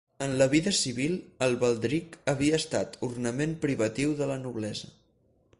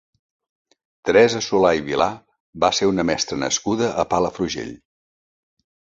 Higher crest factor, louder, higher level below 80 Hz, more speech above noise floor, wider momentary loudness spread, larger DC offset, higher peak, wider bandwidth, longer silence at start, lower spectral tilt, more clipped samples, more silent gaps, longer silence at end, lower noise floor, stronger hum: about the same, 18 dB vs 20 dB; second, -28 LUFS vs -20 LUFS; second, -58 dBFS vs -50 dBFS; second, 39 dB vs over 71 dB; about the same, 10 LU vs 11 LU; neither; second, -10 dBFS vs -2 dBFS; first, 11.5 kHz vs 8 kHz; second, 0.2 s vs 1.05 s; about the same, -4.5 dB/octave vs -3.5 dB/octave; neither; second, none vs 2.40-2.53 s; second, 0.7 s vs 1.2 s; second, -67 dBFS vs under -90 dBFS; neither